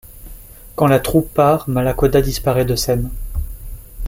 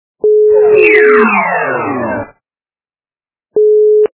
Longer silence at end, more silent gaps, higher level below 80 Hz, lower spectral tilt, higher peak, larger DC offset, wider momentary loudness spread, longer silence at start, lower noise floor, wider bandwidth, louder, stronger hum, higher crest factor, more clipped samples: about the same, 0 s vs 0.1 s; neither; first, -28 dBFS vs -52 dBFS; second, -6 dB/octave vs -9 dB/octave; about the same, -2 dBFS vs 0 dBFS; neither; first, 16 LU vs 13 LU; second, 0.05 s vs 0.25 s; second, -37 dBFS vs under -90 dBFS; first, 17 kHz vs 4 kHz; second, -17 LUFS vs -9 LUFS; neither; first, 16 dB vs 10 dB; second, under 0.1% vs 0.3%